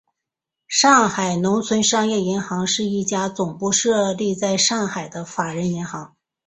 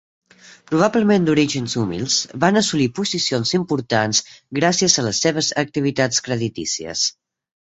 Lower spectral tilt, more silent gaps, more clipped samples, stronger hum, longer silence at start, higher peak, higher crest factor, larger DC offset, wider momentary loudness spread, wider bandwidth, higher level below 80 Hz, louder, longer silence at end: about the same, -3.5 dB/octave vs -3.5 dB/octave; neither; neither; neither; first, 0.7 s vs 0.45 s; about the same, -2 dBFS vs 0 dBFS; about the same, 20 dB vs 20 dB; neither; first, 11 LU vs 7 LU; about the same, 8.4 kHz vs 8.2 kHz; second, -60 dBFS vs -54 dBFS; about the same, -19 LUFS vs -19 LUFS; second, 0.4 s vs 0.55 s